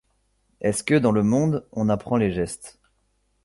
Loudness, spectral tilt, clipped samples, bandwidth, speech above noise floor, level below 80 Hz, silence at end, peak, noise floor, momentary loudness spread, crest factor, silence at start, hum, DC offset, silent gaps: -23 LUFS; -6.5 dB/octave; under 0.1%; 11.5 kHz; 47 dB; -50 dBFS; 0.75 s; -6 dBFS; -68 dBFS; 9 LU; 18 dB; 0.6 s; none; under 0.1%; none